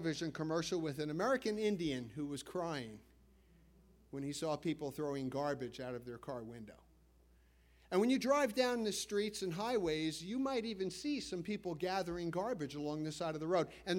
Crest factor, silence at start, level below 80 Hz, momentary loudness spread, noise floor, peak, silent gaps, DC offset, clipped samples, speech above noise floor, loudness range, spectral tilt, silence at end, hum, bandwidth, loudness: 20 dB; 0 s; -68 dBFS; 11 LU; -67 dBFS; -18 dBFS; none; under 0.1%; under 0.1%; 29 dB; 7 LU; -5 dB/octave; 0 s; none; 16 kHz; -39 LUFS